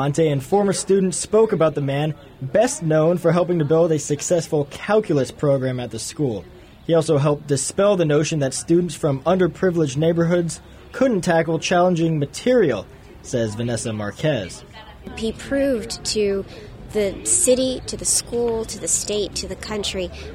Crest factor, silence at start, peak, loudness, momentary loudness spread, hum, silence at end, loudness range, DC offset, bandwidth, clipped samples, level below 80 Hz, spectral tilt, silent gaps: 16 dB; 0 s; -4 dBFS; -20 LUFS; 10 LU; none; 0 s; 5 LU; under 0.1%; 16 kHz; under 0.1%; -46 dBFS; -5 dB/octave; none